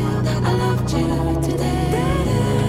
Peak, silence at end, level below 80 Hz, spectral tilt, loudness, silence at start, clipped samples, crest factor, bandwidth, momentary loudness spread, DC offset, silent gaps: -6 dBFS; 0 s; -30 dBFS; -6.5 dB/octave; -20 LUFS; 0 s; under 0.1%; 12 dB; 15.5 kHz; 2 LU; under 0.1%; none